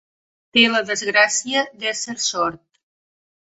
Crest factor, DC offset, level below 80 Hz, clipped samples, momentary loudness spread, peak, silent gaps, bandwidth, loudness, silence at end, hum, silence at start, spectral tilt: 20 dB; under 0.1%; -64 dBFS; under 0.1%; 9 LU; -2 dBFS; none; 8.2 kHz; -18 LUFS; 0.85 s; none; 0.55 s; -1 dB/octave